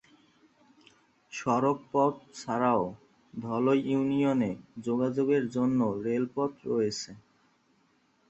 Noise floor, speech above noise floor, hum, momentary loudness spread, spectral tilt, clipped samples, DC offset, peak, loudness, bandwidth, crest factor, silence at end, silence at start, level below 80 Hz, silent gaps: -68 dBFS; 40 dB; none; 11 LU; -6.5 dB/octave; under 0.1%; under 0.1%; -12 dBFS; -29 LUFS; 8.2 kHz; 18 dB; 1.1 s; 1.3 s; -68 dBFS; none